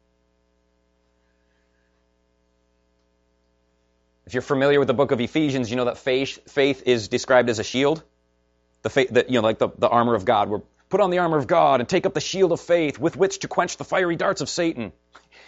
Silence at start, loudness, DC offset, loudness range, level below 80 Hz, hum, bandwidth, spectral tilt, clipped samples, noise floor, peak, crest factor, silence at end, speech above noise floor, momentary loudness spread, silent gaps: 4.25 s; -22 LUFS; under 0.1%; 4 LU; -58 dBFS; 60 Hz at -55 dBFS; 8 kHz; -4 dB/octave; under 0.1%; -66 dBFS; -4 dBFS; 18 dB; 0.55 s; 45 dB; 7 LU; none